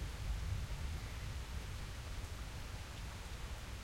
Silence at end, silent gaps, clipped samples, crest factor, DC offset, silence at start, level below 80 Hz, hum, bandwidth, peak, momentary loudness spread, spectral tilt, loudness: 0 s; none; under 0.1%; 14 dB; under 0.1%; 0 s; -46 dBFS; none; 16.5 kHz; -30 dBFS; 5 LU; -4.5 dB/octave; -46 LUFS